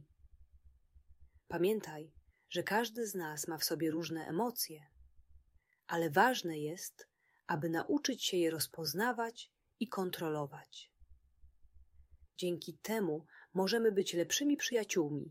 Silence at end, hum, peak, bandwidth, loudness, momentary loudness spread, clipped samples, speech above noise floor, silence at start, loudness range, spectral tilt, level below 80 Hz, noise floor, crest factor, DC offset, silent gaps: 0 s; none; -14 dBFS; 16 kHz; -36 LUFS; 15 LU; under 0.1%; 35 dB; 0.4 s; 7 LU; -3.5 dB/octave; -70 dBFS; -71 dBFS; 24 dB; under 0.1%; none